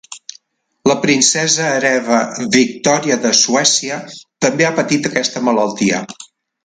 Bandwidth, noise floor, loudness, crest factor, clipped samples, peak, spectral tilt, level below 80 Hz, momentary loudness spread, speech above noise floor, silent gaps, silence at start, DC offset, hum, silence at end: 11 kHz; -51 dBFS; -14 LUFS; 16 dB; under 0.1%; 0 dBFS; -2.5 dB/octave; -58 dBFS; 15 LU; 36 dB; none; 0.1 s; under 0.1%; none; 0.4 s